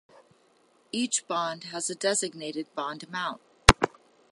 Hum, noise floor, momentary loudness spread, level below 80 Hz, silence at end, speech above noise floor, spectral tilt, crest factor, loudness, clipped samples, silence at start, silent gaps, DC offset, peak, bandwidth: none; -64 dBFS; 14 LU; -40 dBFS; 0.45 s; 33 dB; -3 dB/octave; 30 dB; -28 LUFS; under 0.1%; 0.95 s; none; under 0.1%; 0 dBFS; 16 kHz